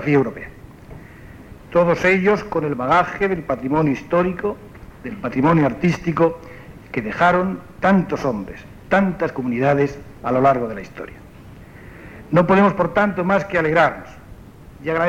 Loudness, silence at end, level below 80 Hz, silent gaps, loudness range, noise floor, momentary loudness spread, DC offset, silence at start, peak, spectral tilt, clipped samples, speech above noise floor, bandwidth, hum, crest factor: -19 LUFS; 0 s; -46 dBFS; none; 2 LU; -41 dBFS; 20 LU; under 0.1%; 0 s; -4 dBFS; -7.5 dB/octave; under 0.1%; 22 dB; 11.5 kHz; none; 16 dB